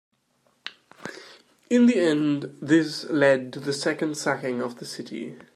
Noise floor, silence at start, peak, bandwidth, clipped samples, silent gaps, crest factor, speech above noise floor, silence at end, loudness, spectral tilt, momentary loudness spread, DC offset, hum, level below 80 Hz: -67 dBFS; 0.65 s; -8 dBFS; 13 kHz; under 0.1%; none; 18 dB; 44 dB; 0.15 s; -24 LUFS; -5 dB/octave; 21 LU; under 0.1%; none; -76 dBFS